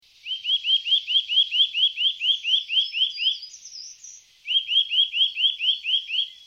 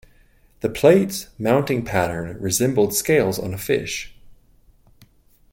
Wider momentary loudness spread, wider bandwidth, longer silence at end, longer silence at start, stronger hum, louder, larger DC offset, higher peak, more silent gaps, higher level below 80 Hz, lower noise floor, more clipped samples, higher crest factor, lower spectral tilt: about the same, 14 LU vs 12 LU; second, 10 kHz vs 17 kHz; second, 0.1 s vs 1.2 s; second, 0.25 s vs 0.65 s; neither; about the same, -20 LUFS vs -20 LUFS; neither; second, -10 dBFS vs -2 dBFS; neither; second, -78 dBFS vs -48 dBFS; second, -47 dBFS vs -54 dBFS; neither; second, 14 dB vs 20 dB; second, 6 dB/octave vs -4.5 dB/octave